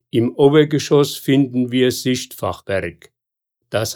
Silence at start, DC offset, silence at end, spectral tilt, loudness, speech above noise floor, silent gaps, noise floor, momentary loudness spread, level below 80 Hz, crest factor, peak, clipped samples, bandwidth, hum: 0.15 s; under 0.1%; 0 s; -5.5 dB/octave; -17 LUFS; 63 dB; none; -79 dBFS; 12 LU; -56 dBFS; 16 dB; -2 dBFS; under 0.1%; 19.5 kHz; none